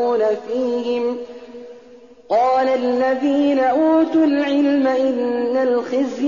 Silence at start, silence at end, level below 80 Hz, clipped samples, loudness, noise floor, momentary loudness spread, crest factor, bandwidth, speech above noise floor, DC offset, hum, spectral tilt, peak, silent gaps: 0 s; 0 s; -62 dBFS; under 0.1%; -18 LUFS; -44 dBFS; 8 LU; 10 dB; 7.2 kHz; 27 dB; 0.2%; none; -3 dB/octave; -8 dBFS; none